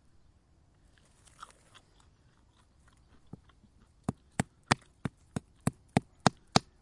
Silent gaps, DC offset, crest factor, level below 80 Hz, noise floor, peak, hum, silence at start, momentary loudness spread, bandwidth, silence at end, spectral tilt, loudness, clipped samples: none; under 0.1%; 34 dB; -60 dBFS; -65 dBFS; -4 dBFS; none; 4.1 s; 24 LU; 11.5 kHz; 0.2 s; -4.5 dB/octave; -34 LUFS; under 0.1%